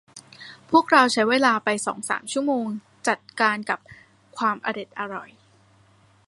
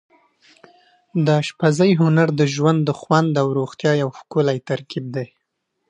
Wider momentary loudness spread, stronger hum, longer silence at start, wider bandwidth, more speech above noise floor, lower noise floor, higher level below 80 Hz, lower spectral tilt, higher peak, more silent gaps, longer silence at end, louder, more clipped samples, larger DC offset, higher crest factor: first, 16 LU vs 11 LU; neither; second, 0.15 s vs 1.15 s; first, 11.5 kHz vs 9.4 kHz; second, 35 dB vs 56 dB; second, -57 dBFS vs -74 dBFS; second, -72 dBFS vs -66 dBFS; second, -3 dB/octave vs -7 dB/octave; about the same, -2 dBFS vs -2 dBFS; neither; first, 1.05 s vs 0.65 s; second, -23 LUFS vs -19 LUFS; neither; neither; about the same, 22 dB vs 18 dB